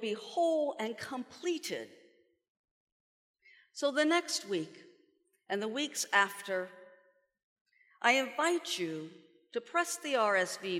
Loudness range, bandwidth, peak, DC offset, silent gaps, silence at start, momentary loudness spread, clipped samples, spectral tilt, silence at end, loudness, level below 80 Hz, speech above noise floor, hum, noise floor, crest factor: 5 LU; 17 kHz; -12 dBFS; under 0.1%; 2.49-2.64 s, 2.71-3.34 s, 7.44-7.65 s; 0 s; 14 LU; under 0.1%; -2.5 dB/octave; 0 s; -33 LUFS; under -90 dBFS; 39 dB; none; -72 dBFS; 24 dB